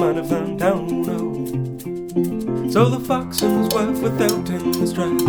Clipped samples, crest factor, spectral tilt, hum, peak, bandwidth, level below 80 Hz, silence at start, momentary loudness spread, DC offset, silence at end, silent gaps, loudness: under 0.1%; 18 dB; -6 dB/octave; none; -2 dBFS; over 20 kHz; -48 dBFS; 0 s; 7 LU; under 0.1%; 0 s; none; -21 LUFS